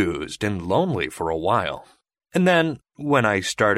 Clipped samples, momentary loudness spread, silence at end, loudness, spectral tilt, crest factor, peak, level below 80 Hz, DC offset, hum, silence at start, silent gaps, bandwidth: under 0.1%; 9 LU; 0 s; -22 LUFS; -5 dB/octave; 18 dB; -4 dBFS; -50 dBFS; under 0.1%; none; 0 s; none; 15.5 kHz